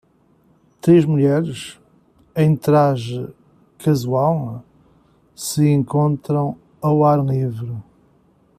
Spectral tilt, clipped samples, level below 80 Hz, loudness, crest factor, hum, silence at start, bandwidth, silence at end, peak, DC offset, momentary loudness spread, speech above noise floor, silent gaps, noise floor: -7.5 dB/octave; under 0.1%; -56 dBFS; -18 LUFS; 16 dB; none; 0.85 s; 14.5 kHz; 0.8 s; -4 dBFS; under 0.1%; 16 LU; 40 dB; none; -57 dBFS